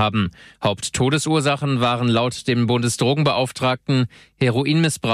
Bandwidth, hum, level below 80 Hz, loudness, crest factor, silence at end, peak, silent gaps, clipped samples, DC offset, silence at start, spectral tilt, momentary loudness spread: 14 kHz; none; -50 dBFS; -20 LUFS; 12 dB; 0 s; -6 dBFS; none; under 0.1%; under 0.1%; 0 s; -5 dB/octave; 5 LU